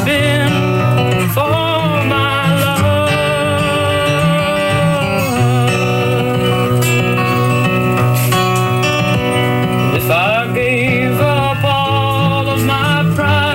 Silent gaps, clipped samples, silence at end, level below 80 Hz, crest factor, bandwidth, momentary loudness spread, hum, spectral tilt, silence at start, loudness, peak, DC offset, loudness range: none; under 0.1%; 0 s; -38 dBFS; 8 dB; 16.5 kHz; 1 LU; none; -5.5 dB/octave; 0 s; -13 LUFS; -4 dBFS; under 0.1%; 0 LU